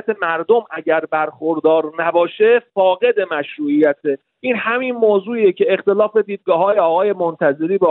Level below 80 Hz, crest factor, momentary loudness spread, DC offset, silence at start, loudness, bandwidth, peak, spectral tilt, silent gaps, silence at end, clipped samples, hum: -82 dBFS; 12 dB; 6 LU; under 0.1%; 0.05 s; -16 LUFS; 4.1 kHz; -4 dBFS; -9 dB/octave; none; 0 s; under 0.1%; none